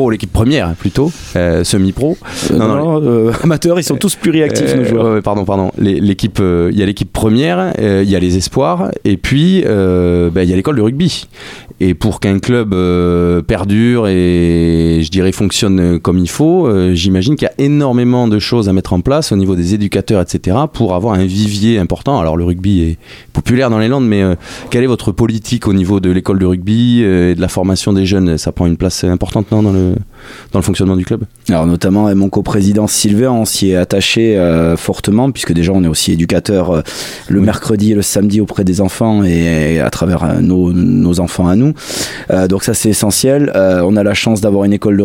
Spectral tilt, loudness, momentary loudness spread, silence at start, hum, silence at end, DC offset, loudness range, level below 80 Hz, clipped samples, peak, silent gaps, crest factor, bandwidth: -6 dB/octave; -12 LUFS; 4 LU; 0 s; none; 0 s; under 0.1%; 2 LU; -32 dBFS; under 0.1%; 0 dBFS; none; 10 dB; 17 kHz